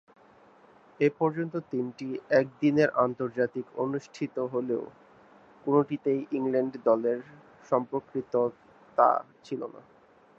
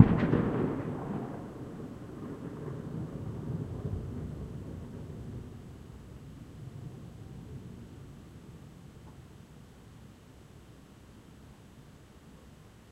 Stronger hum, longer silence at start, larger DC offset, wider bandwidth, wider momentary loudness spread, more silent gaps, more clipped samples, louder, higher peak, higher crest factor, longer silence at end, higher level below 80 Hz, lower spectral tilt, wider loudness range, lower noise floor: neither; first, 1 s vs 0 s; neither; second, 7.6 kHz vs 15 kHz; second, 11 LU vs 20 LU; neither; neither; first, -29 LUFS vs -37 LUFS; second, -6 dBFS vs -2 dBFS; second, 22 dB vs 32 dB; first, 0.6 s vs 0 s; second, -74 dBFS vs -52 dBFS; about the same, -8 dB/octave vs -8.5 dB/octave; second, 2 LU vs 15 LU; about the same, -57 dBFS vs -54 dBFS